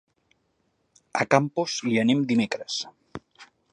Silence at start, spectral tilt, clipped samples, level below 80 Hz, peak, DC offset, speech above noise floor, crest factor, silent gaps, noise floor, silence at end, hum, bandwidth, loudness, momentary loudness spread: 1.15 s; -5 dB/octave; under 0.1%; -68 dBFS; -2 dBFS; under 0.1%; 48 dB; 24 dB; none; -71 dBFS; 0.3 s; none; 10.5 kHz; -24 LUFS; 20 LU